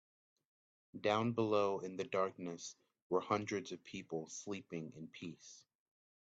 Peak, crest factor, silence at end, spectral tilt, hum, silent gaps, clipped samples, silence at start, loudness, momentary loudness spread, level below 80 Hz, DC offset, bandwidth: -20 dBFS; 22 dB; 0.6 s; -5 dB/octave; none; 3.02-3.10 s; under 0.1%; 0.95 s; -40 LUFS; 15 LU; -82 dBFS; under 0.1%; 8 kHz